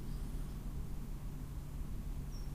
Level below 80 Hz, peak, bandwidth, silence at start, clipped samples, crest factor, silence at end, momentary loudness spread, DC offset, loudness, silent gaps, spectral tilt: -44 dBFS; -32 dBFS; 15.5 kHz; 0 s; under 0.1%; 10 dB; 0 s; 2 LU; under 0.1%; -47 LUFS; none; -6.5 dB/octave